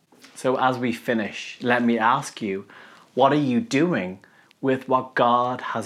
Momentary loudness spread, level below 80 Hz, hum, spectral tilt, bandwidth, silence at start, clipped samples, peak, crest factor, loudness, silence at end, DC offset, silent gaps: 10 LU; -78 dBFS; none; -5.5 dB/octave; 14 kHz; 0.35 s; under 0.1%; -4 dBFS; 20 dB; -23 LUFS; 0 s; under 0.1%; none